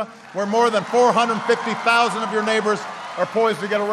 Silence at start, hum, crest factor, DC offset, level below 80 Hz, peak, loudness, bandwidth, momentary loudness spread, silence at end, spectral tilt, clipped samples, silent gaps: 0 s; none; 16 dB; under 0.1%; -68 dBFS; -4 dBFS; -19 LUFS; 12.5 kHz; 9 LU; 0 s; -4 dB/octave; under 0.1%; none